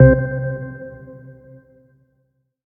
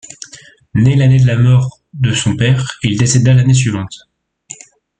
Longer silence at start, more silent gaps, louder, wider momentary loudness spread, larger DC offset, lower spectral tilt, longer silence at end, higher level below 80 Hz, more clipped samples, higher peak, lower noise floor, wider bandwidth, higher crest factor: second, 0 s vs 0.35 s; neither; second, -20 LUFS vs -12 LUFS; first, 25 LU vs 22 LU; neither; first, -14 dB/octave vs -5.5 dB/octave; first, 1.45 s vs 1.05 s; first, -34 dBFS vs -42 dBFS; neither; about the same, 0 dBFS vs 0 dBFS; first, -67 dBFS vs -40 dBFS; second, 2.2 kHz vs 9.4 kHz; first, 20 dB vs 12 dB